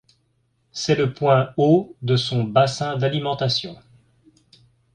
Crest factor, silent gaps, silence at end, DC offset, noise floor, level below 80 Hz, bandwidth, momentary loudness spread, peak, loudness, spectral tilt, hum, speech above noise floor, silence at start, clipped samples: 20 dB; none; 1.2 s; under 0.1%; -67 dBFS; -58 dBFS; 9.8 kHz; 7 LU; -2 dBFS; -20 LUFS; -6 dB/octave; none; 47 dB; 0.75 s; under 0.1%